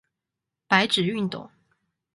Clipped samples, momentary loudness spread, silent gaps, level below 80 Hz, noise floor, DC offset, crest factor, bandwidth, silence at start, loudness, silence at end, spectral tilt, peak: under 0.1%; 12 LU; none; -66 dBFS; -86 dBFS; under 0.1%; 24 dB; 11.5 kHz; 0.7 s; -23 LUFS; 0.65 s; -4.5 dB/octave; -4 dBFS